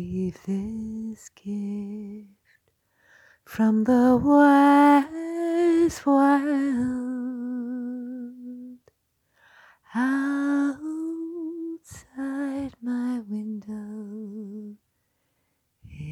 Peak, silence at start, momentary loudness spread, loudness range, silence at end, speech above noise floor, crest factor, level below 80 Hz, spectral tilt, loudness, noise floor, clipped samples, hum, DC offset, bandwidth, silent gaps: -6 dBFS; 0 s; 21 LU; 14 LU; 0 s; 50 dB; 18 dB; -58 dBFS; -6.5 dB/octave; -24 LUFS; -73 dBFS; under 0.1%; none; under 0.1%; 12.5 kHz; none